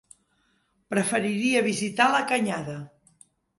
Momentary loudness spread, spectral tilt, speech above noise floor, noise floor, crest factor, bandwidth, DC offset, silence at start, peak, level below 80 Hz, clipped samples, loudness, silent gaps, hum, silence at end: 11 LU; -4 dB/octave; 45 dB; -69 dBFS; 20 dB; 11.5 kHz; under 0.1%; 0.9 s; -8 dBFS; -68 dBFS; under 0.1%; -24 LUFS; none; none; 0.7 s